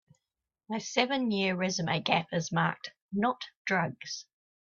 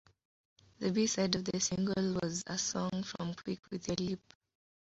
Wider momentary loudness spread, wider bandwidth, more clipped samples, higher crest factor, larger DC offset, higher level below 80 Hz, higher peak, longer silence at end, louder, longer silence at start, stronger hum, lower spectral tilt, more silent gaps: about the same, 11 LU vs 9 LU; about the same, 7.4 kHz vs 8 kHz; neither; about the same, 22 dB vs 22 dB; neither; second, -72 dBFS vs -64 dBFS; first, -10 dBFS vs -14 dBFS; second, 0.4 s vs 0.7 s; first, -31 LUFS vs -35 LUFS; about the same, 0.7 s vs 0.8 s; neither; about the same, -4.5 dB/octave vs -5 dB/octave; first, 3.02-3.09 s, 3.57-3.65 s vs 3.59-3.63 s